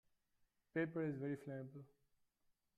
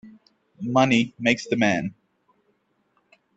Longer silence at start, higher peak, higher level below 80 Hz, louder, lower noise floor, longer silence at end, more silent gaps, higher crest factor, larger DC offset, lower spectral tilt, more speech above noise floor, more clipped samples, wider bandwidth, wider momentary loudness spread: first, 0.75 s vs 0.05 s; second, -28 dBFS vs -2 dBFS; second, -84 dBFS vs -64 dBFS; second, -45 LUFS vs -22 LUFS; first, -83 dBFS vs -69 dBFS; second, 0.95 s vs 1.45 s; neither; about the same, 20 dB vs 22 dB; neither; first, -9 dB/octave vs -5 dB/octave; second, 38 dB vs 47 dB; neither; first, 11.5 kHz vs 8.2 kHz; about the same, 13 LU vs 12 LU